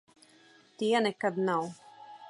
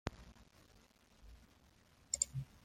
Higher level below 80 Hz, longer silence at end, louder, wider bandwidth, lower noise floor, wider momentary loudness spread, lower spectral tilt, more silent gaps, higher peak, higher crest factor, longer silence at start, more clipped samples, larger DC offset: second, -84 dBFS vs -62 dBFS; about the same, 0 s vs 0.05 s; first, -30 LUFS vs -40 LUFS; second, 11.5 kHz vs 16.5 kHz; second, -60 dBFS vs -68 dBFS; second, 20 LU vs 27 LU; first, -5 dB/octave vs -2.5 dB/octave; neither; about the same, -16 dBFS vs -16 dBFS; second, 18 dB vs 32 dB; first, 0.8 s vs 0.05 s; neither; neither